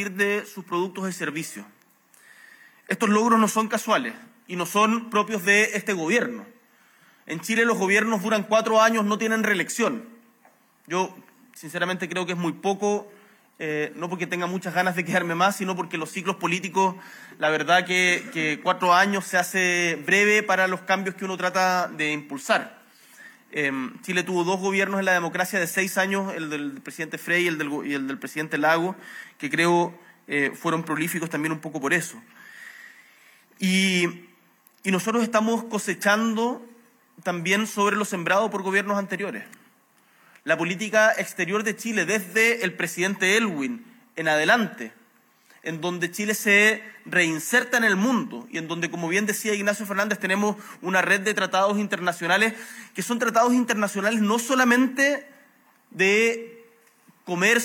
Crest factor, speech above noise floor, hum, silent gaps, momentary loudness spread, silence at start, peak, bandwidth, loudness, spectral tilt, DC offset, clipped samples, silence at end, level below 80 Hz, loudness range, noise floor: 20 dB; 37 dB; none; none; 12 LU; 0 s; -6 dBFS; 17.5 kHz; -23 LUFS; -4 dB/octave; under 0.1%; under 0.1%; 0 s; -90 dBFS; 5 LU; -60 dBFS